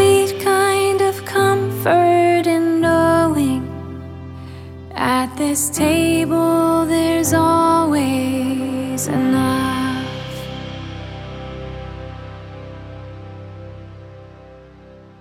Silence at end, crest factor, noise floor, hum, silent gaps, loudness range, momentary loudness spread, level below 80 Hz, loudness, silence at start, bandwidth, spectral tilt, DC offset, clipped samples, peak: 0.2 s; 16 dB; -42 dBFS; none; none; 17 LU; 20 LU; -44 dBFS; -17 LUFS; 0 s; 17 kHz; -5 dB/octave; under 0.1%; under 0.1%; -2 dBFS